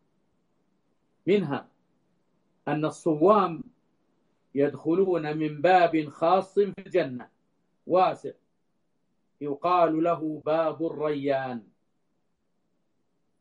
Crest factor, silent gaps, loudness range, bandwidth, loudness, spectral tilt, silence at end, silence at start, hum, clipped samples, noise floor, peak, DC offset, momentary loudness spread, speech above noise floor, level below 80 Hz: 22 dB; none; 5 LU; 10.5 kHz; -26 LUFS; -7 dB/octave; 1.8 s; 1.25 s; none; under 0.1%; -77 dBFS; -6 dBFS; under 0.1%; 14 LU; 52 dB; -72 dBFS